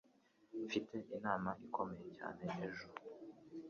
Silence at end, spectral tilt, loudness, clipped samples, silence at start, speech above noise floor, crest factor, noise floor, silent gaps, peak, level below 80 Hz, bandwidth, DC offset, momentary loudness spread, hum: 0 s; -4.5 dB/octave; -45 LUFS; under 0.1%; 0.5 s; 28 dB; 22 dB; -73 dBFS; none; -24 dBFS; -76 dBFS; 7.2 kHz; under 0.1%; 12 LU; none